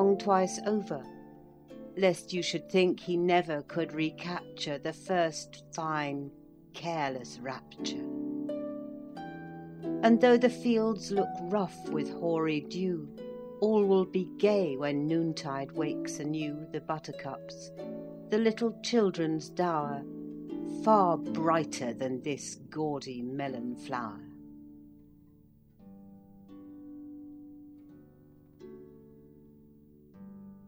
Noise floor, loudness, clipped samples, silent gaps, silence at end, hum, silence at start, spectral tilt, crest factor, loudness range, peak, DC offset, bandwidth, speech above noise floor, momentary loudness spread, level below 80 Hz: -60 dBFS; -31 LUFS; under 0.1%; none; 0 s; none; 0 s; -5.5 dB/octave; 22 dB; 22 LU; -10 dBFS; under 0.1%; 16 kHz; 30 dB; 21 LU; -70 dBFS